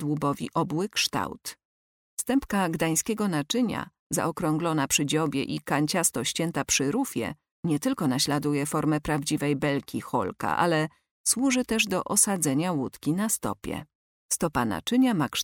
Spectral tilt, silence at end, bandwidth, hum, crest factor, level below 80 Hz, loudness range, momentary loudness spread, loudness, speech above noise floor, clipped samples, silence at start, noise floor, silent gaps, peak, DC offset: -4 dB/octave; 0 s; 18 kHz; none; 18 dB; -56 dBFS; 3 LU; 8 LU; -26 LUFS; over 64 dB; under 0.1%; 0 s; under -90 dBFS; 1.65-2.17 s, 3.99-4.10 s, 7.51-7.63 s, 11.11-11.24 s, 13.95-14.29 s; -8 dBFS; under 0.1%